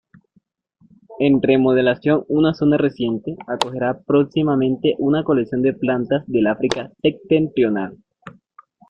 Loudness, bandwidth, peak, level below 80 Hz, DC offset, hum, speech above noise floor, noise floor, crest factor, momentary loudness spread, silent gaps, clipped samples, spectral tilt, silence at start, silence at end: -19 LUFS; 10.5 kHz; 0 dBFS; -54 dBFS; under 0.1%; none; 44 dB; -62 dBFS; 18 dB; 8 LU; none; under 0.1%; -7 dB/octave; 1.1 s; 0.6 s